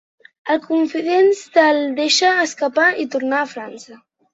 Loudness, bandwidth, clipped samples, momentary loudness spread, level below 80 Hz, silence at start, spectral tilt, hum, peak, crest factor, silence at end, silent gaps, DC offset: -17 LUFS; 8.2 kHz; under 0.1%; 10 LU; -70 dBFS; 0.45 s; -1.5 dB/octave; none; -2 dBFS; 16 dB; 0.4 s; none; under 0.1%